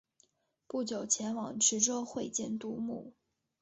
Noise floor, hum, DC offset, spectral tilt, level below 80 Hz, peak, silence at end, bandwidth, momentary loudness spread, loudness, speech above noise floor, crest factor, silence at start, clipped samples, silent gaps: -72 dBFS; none; under 0.1%; -2.5 dB/octave; -74 dBFS; -14 dBFS; 0.5 s; 8.2 kHz; 12 LU; -33 LUFS; 38 dB; 22 dB; 0.75 s; under 0.1%; none